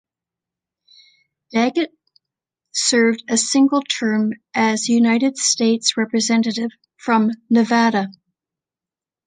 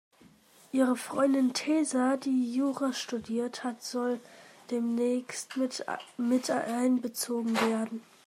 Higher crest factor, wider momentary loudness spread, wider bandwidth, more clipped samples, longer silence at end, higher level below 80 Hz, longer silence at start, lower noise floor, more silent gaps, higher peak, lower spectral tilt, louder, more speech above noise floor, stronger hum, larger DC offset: about the same, 18 dB vs 16 dB; about the same, 9 LU vs 8 LU; second, 9.8 kHz vs 15.5 kHz; neither; first, 1.15 s vs 0.25 s; first, -70 dBFS vs -80 dBFS; first, 1.55 s vs 0.75 s; first, -90 dBFS vs -59 dBFS; neither; first, -2 dBFS vs -14 dBFS; about the same, -3 dB/octave vs -3.5 dB/octave; first, -18 LUFS vs -30 LUFS; first, 72 dB vs 30 dB; neither; neither